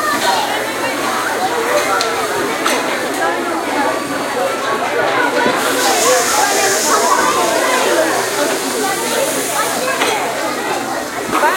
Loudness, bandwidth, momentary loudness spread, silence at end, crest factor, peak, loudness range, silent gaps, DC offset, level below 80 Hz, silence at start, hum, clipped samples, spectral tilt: -15 LUFS; 16.5 kHz; 6 LU; 0 s; 16 dB; 0 dBFS; 4 LU; none; under 0.1%; -54 dBFS; 0 s; none; under 0.1%; -1.5 dB/octave